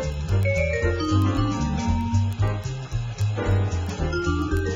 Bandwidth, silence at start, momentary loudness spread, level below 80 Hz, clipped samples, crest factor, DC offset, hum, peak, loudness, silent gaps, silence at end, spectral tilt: 7.6 kHz; 0 s; 5 LU; -32 dBFS; under 0.1%; 14 dB; under 0.1%; none; -10 dBFS; -24 LUFS; none; 0 s; -6.5 dB/octave